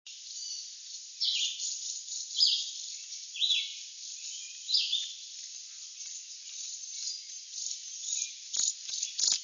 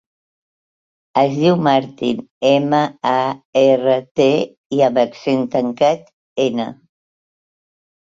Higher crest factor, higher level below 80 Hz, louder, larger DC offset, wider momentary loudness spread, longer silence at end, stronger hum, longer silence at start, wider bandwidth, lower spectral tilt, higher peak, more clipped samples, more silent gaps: first, 24 dB vs 16 dB; second, -88 dBFS vs -62 dBFS; second, -32 LUFS vs -17 LUFS; neither; first, 14 LU vs 8 LU; second, 0 s vs 1.3 s; neither; second, 0.05 s vs 1.15 s; about the same, 7.6 kHz vs 7.6 kHz; second, 6 dB/octave vs -6.5 dB/octave; second, -12 dBFS vs -2 dBFS; neither; second, none vs 2.31-2.41 s, 3.45-3.53 s, 4.11-4.15 s, 4.57-4.70 s, 6.13-6.36 s